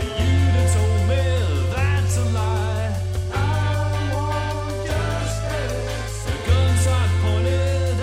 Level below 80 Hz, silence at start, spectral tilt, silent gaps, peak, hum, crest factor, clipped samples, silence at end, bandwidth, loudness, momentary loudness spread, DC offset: -30 dBFS; 0 s; -5.5 dB/octave; none; -6 dBFS; none; 14 dB; under 0.1%; 0 s; 13.5 kHz; -21 LUFS; 7 LU; under 0.1%